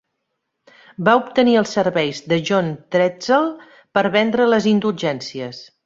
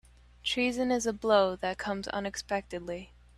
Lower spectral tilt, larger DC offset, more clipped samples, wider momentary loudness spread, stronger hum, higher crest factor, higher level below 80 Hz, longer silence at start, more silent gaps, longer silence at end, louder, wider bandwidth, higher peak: first, -5.5 dB/octave vs -3.5 dB/octave; neither; neither; second, 9 LU vs 13 LU; neither; about the same, 18 dB vs 20 dB; about the same, -60 dBFS vs -56 dBFS; first, 1 s vs 0.45 s; neither; about the same, 0.2 s vs 0.3 s; first, -18 LUFS vs -31 LUFS; second, 7.8 kHz vs 13 kHz; first, -2 dBFS vs -12 dBFS